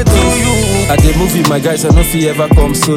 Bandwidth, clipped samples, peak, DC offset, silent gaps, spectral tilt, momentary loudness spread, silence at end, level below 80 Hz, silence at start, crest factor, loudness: 17.5 kHz; under 0.1%; 0 dBFS; under 0.1%; none; -5 dB/octave; 2 LU; 0 s; -16 dBFS; 0 s; 10 dB; -10 LUFS